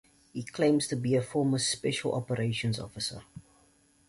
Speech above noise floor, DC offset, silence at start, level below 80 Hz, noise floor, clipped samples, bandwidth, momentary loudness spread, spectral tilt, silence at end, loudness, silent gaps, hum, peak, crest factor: 35 dB; under 0.1%; 0.35 s; -62 dBFS; -65 dBFS; under 0.1%; 11.5 kHz; 12 LU; -5 dB/octave; 0.7 s; -30 LUFS; none; none; -14 dBFS; 16 dB